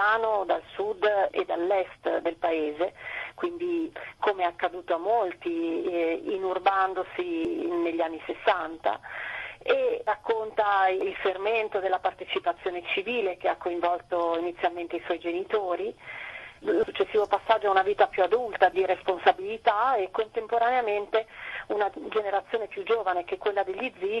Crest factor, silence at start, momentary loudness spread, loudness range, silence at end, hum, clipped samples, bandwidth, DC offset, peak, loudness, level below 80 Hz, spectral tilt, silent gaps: 22 dB; 0 s; 8 LU; 5 LU; 0 s; none; under 0.1%; 12 kHz; under 0.1%; -6 dBFS; -27 LUFS; -64 dBFS; -5 dB/octave; none